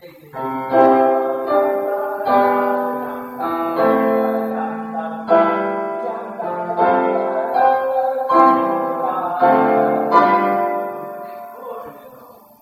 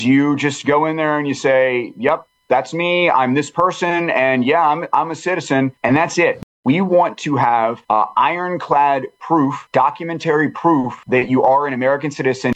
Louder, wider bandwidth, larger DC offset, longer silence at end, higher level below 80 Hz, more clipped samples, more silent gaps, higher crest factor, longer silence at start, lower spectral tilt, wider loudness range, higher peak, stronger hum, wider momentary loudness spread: about the same, -17 LUFS vs -17 LUFS; first, 16 kHz vs 9 kHz; neither; first, 0.35 s vs 0 s; about the same, -64 dBFS vs -60 dBFS; neither; second, none vs 6.43-6.63 s; about the same, 18 dB vs 16 dB; about the same, 0.05 s vs 0 s; first, -7.5 dB/octave vs -5.5 dB/octave; about the same, 3 LU vs 1 LU; about the same, 0 dBFS vs 0 dBFS; neither; first, 14 LU vs 5 LU